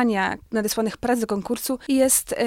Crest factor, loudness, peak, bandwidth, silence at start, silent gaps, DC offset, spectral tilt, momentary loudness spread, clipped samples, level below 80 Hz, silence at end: 18 dB; -23 LUFS; -6 dBFS; 17 kHz; 0 s; none; under 0.1%; -3 dB/octave; 8 LU; under 0.1%; -52 dBFS; 0 s